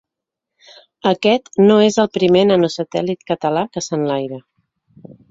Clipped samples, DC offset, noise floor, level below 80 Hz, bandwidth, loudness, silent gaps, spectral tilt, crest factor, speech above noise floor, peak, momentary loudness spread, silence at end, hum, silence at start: under 0.1%; under 0.1%; -82 dBFS; -58 dBFS; 7.8 kHz; -16 LUFS; none; -5.5 dB/octave; 16 dB; 67 dB; -2 dBFS; 10 LU; 0.9 s; none; 1.05 s